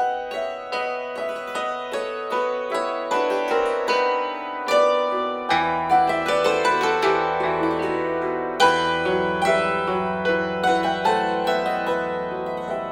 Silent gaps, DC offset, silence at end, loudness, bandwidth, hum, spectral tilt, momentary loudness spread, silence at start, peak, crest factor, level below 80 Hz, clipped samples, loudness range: none; under 0.1%; 0 s; -22 LUFS; 17 kHz; none; -4.5 dB/octave; 8 LU; 0 s; -4 dBFS; 18 dB; -56 dBFS; under 0.1%; 4 LU